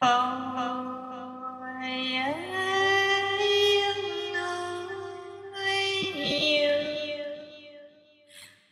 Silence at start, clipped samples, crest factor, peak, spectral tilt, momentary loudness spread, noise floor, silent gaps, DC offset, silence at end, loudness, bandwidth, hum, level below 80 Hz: 0 s; under 0.1%; 18 dB; -10 dBFS; -2.5 dB/octave; 16 LU; -56 dBFS; none; under 0.1%; 0.25 s; -27 LUFS; 14 kHz; none; -70 dBFS